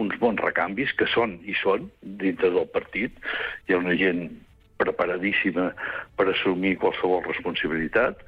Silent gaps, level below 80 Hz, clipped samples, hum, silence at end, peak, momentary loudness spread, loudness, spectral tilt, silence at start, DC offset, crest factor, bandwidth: none; -54 dBFS; under 0.1%; none; 0.05 s; -10 dBFS; 6 LU; -25 LUFS; -7.5 dB/octave; 0 s; under 0.1%; 14 dB; 5.2 kHz